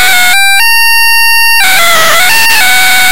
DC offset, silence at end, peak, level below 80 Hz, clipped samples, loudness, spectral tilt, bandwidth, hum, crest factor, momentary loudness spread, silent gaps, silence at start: 30%; 0 s; 0 dBFS; -42 dBFS; 0.2%; -3 LUFS; 1 dB/octave; over 20 kHz; none; 8 dB; 0 LU; none; 0 s